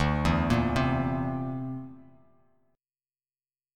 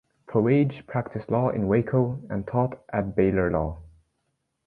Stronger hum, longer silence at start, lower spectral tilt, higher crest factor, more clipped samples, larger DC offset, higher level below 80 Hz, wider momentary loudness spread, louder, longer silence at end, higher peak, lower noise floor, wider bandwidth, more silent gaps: neither; second, 0 s vs 0.3 s; second, -7 dB/octave vs -11.5 dB/octave; about the same, 18 dB vs 18 dB; neither; neither; about the same, -42 dBFS vs -46 dBFS; first, 13 LU vs 9 LU; second, -28 LUFS vs -25 LUFS; first, 1.75 s vs 0.8 s; second, -12 dBFS vs -8 dBFS; first, under -90 dBFS vs -76 dBFS; first, 14 kHz vs 4.4 kHz; neither